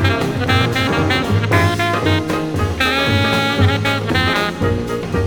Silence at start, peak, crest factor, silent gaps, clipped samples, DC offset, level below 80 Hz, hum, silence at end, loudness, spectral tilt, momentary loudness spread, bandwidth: 0 s; 0 dBFS; 16 dB; none; under 0.1%; under 0.1%; -34 dBFS; none; 0 s; -16 LUFS; -5.5 dB/octave; 5 LU; 20 kHz